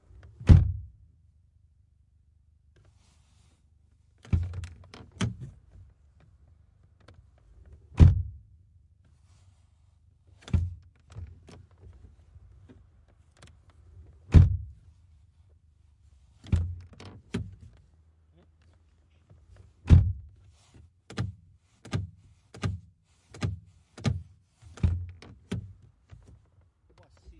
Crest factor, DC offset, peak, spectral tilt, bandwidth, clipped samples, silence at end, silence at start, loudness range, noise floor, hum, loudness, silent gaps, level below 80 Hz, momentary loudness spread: 26 dB; under 0.1%; -4 dBFS; -8 dB/octave; 9.8 kHz; under 0.1%; 1.75 s; 0.4 s; 11 LU; -63 dBFS; none; -27 LUFS; none; -38 dBFS; 27 LU